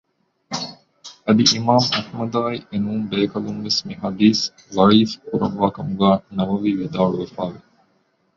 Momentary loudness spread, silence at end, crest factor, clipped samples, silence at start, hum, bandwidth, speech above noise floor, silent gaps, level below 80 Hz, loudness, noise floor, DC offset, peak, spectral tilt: 13 LU; 0.8 s; 18 dB; under 0.1%; 0.5 s; none; 7.6 kHz; 45 dB; none; -54 dBFS; -20 LUFS; -64 dBFS; under 0.1%; -2 dBFS; -5 dB/octave